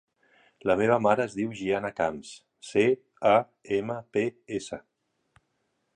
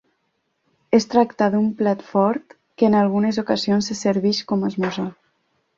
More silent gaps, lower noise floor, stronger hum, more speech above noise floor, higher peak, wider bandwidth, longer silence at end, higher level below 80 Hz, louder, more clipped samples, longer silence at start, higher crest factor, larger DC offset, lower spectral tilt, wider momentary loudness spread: neither; first, -76 dBFS vs -71 dBFS; neither; about the same, 50 dB vs 52 dB; second, -8 dBFS vs -2 dBFS; first, 10.5 kHz vs 7.6 kHz; first, 1.15 s vs 0.65 s; about the same, -64 dBFS vs -60 dBFS; second, -27 LUFS vs -20 LUFS; neither; second, 0.65 s vs 0.9 s; about the same, 20 dB vs 18 dB; neither; about the same, -6 dB/octave vs -6 dB/octave; first, 15 LU vs 7 LU